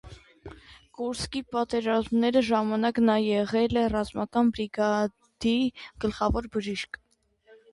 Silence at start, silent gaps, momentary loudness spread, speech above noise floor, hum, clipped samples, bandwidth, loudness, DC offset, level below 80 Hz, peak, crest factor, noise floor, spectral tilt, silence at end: 0.05 s; none; 11 LU; 34 dB; none; under 0.1%; 11.5 kHz; -27 LUFS; under 0.1%; -46 dBFS; -12 dBFS; 16 dB; -60 dBFS; -5.5 dB/octave; 0.85 s